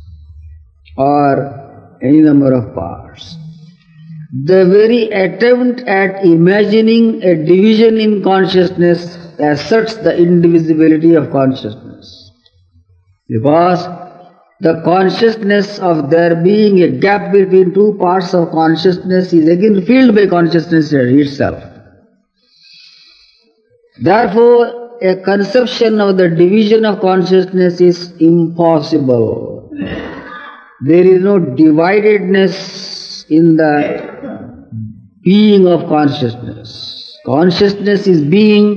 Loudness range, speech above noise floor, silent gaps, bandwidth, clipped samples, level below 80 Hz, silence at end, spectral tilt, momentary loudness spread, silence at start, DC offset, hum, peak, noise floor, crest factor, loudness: 5 LU; 45 dB; none; 7 kHz; 0.2%; -48 dBFS; 0 s; -7.5 dB/octave; 17 LU; 0.05 s; under 0.1%; none; 0 dBFS; -55 dBFS; 10 dB; -10 LUFS